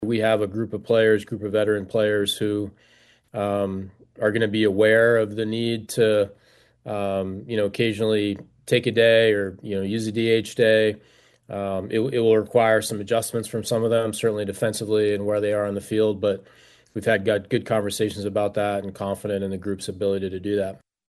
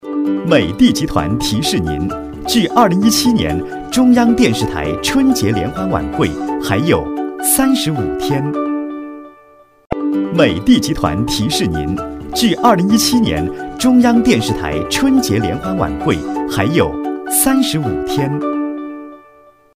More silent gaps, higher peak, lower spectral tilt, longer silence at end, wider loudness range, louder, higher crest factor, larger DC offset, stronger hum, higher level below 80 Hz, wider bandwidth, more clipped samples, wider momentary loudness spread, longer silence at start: neither; second, -4 dBFS vs 0 dBFS; about the same, -5 dB/octave vs -4.5 dB/octave; second, 0.35 s vs 0.55 s; about the same, 4 LU vs 4 LU; second, -23 LUFS vs -15 LUFS; about the same, 18 dB vs 14 dB; neither; neither; second, -62 dBFS vs -34 dBFS; second, 12.5 kHz vs 16 kHz; neither; about the same, 11 LU vs 10 LU; about the same, 0 s vs 0.05 s